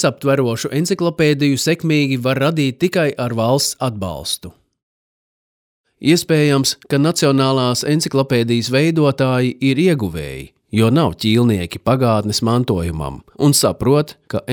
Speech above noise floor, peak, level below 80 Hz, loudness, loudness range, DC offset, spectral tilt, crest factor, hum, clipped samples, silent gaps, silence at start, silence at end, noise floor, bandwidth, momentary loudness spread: over 74 dB; -2 dBFS; -44 dBFS; -16 LUFS; 4 LU; under 0.1%; -5 dB/octave; 14 dB; none; under 0.1%; 4.83-5.84 s; 0 s; 0 s; under -90 dBFS; over 20 kHz; 8 LU